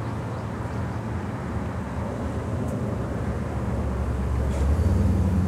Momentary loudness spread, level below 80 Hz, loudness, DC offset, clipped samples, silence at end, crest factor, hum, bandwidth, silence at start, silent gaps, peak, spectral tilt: 8 LU; -30 dBFS; -27 LUFS; under 0.1%; under 0.1%; 0 s; 14 dB; none; 12 kHz; 0 s; none; -12 dBFS; -8 dB/octave